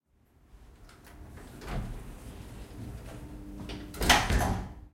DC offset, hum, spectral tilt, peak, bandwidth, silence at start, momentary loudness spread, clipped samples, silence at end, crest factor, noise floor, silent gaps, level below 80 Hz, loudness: under 0.1%; none; -3.5 dB/octave; -6 dBFS; 16.5 kHz; 0.5 s; 25 LU; under 0.1%; 0.05 s; 26 dB; -64 dBFS; none; -40 dBFS; -29 LUFS